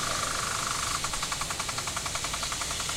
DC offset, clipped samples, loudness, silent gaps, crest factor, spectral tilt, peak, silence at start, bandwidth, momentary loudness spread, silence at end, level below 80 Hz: under 0.1%; under 0.1%; -29 LUFS; none; 16 dB; -1 dB/octave; -16 dBFS; 0 s; 16 kHz; 2 LU; 0 s; -46 dBFS